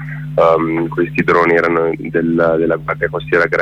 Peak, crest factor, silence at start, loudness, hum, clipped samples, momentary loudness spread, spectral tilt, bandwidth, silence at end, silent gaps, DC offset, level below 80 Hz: -2 dBFS; 12 dB; 0 s; -15 LUFS; none; under 0.1%; 6 LU; -8 dB/octave; 8 kHz; 0 s; none; under 0.1%; -44 dBFS